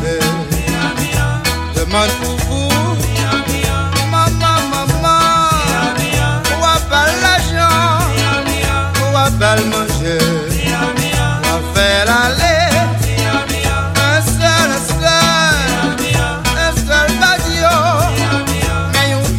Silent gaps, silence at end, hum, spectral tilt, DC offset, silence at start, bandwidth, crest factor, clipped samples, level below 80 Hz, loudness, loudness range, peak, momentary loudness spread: none; 0 s; none; -4 dB/octave; under 0.1%; 0 s; 16.5 kHz; 14 dB; under 0.1%; -26 dBFS; -13 LUFS; 2 LU; 0 dBFS; 5 LU